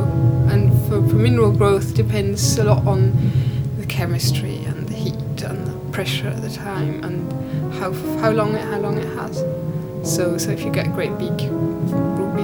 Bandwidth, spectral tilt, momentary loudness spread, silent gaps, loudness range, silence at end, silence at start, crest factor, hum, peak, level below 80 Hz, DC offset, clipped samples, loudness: over 20 kHz; -6.5 dB/octave; 10 LU; none; 7 LU; 0 s; 0 s; 18 dB; none; 0 dBFS; -38 dBFS; under 0.1%; under 0.1%; -20 LUFS